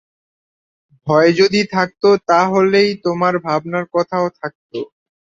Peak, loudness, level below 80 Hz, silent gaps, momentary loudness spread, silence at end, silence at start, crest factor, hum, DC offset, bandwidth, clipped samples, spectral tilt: -2 dBFS; -15 LUFS; -58 dBFS; 4.55-4.70 s; 16 LU; 0.4 s; 1.05 s; 16 dB; none; under 0.1%; 7.8 kHz; under 0.1%; -5.5 dB/octave